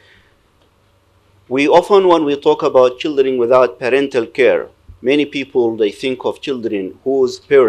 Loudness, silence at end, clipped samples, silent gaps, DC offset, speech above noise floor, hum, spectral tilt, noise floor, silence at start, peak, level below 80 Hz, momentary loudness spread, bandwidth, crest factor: -15 LUFS; 0 s; under 0.1%; none; under 0.1%; 41 dB; none; -5.5 dB/octave; -55 dBFS; 1.5 s; 0 dBFS; -56 dBFS; 10 LU; 10 kHz; 14 dB